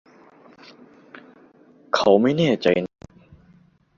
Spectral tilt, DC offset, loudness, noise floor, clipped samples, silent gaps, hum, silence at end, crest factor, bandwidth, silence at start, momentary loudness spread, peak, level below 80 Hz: -6 dB/octave; under 0.1%; -19 LUFS; -56 dBFS; under 0.1%; none; none; 1.1 s; 22 dB; 7.4 kHz; 1.95 s; 9 LU; -2 dBFS; -60 dBFS